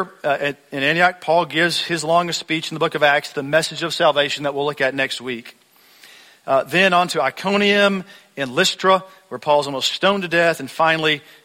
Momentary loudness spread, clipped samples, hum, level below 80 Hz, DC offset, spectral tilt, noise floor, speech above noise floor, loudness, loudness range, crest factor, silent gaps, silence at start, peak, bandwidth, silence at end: 8 LU; under 0.1%; none; -64 dBFS; under 0.1%; -3.5 dB/octave; -49 dBFS; 30 dB; -18 LUFS; 3 LU; 18 dB; none; 0 s; -2 dBFS; 16.5 kHz; 0.25 s